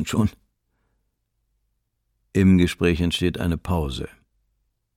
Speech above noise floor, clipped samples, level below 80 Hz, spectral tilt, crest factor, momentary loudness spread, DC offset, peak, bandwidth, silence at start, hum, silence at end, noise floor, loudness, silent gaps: 53 dB; under 0.1%; -40 dBFS; -6.5 dB/octave; 18 dB; 12 LU; under 0.1%; -6 dBFS; 15.5 kHz; 0 s; none; 0.9 s; -73 dBFS; -22 LUFS; none